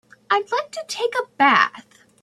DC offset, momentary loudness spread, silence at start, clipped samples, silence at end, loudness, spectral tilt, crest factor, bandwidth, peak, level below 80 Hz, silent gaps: under 0.1%; 10 LU; 0.3 s; under 0.1%; 0.4 s; -20 LUFS; -2.5 dB/octave; 20 dB; 13.5 kHz; -2 dBFS; -74 dBFS; none